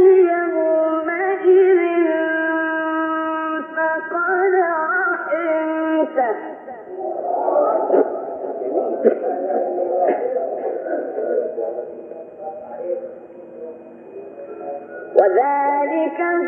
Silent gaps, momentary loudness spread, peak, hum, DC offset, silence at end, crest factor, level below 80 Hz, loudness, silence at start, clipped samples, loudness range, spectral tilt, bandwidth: none; 18 LU; 0 dBFS; none; under 0.1%; 0 s; 20 dB; -76 dBFS; -19 LUFS; 0 s; under 0.1%; 9 LU; -8.5 dB/octave; 3.3 kHz